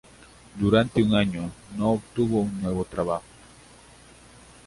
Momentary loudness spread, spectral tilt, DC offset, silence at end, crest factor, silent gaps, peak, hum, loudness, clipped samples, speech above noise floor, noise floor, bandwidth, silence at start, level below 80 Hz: 11 LU; -7 dB/octave; under 0.1%; 1.45 s; 20 dB; none; -6 dBFS; none; -25 LUFS; under 0.1%; 27 dB; -51 dBFS; 11.5 kHz; 0.55 s; -48 dBFS